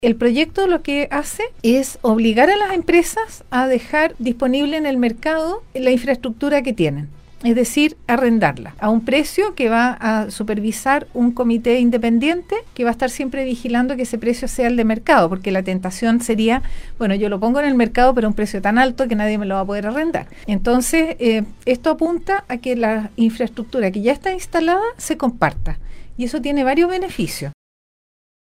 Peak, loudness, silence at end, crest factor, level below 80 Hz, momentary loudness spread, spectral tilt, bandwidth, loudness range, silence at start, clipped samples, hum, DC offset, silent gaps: 0 dBFS; -18 LUFS; 1 s; 18 dB; -36 dBFS; 8 LU; -5 dB/octave; 16 kHz; 3 LU; 0 s; under 0.1%; none; under 0.1%; none